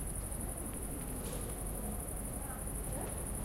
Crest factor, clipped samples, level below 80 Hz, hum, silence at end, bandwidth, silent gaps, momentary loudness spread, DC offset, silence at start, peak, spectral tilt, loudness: 14 dB; under 0.1%; -44 dBFS; none; 0 s; 16 kHz; none; 1 LU; under 0.1%; 0 s; -26 dBFS; -4.5 dB/octave; -40 LUFS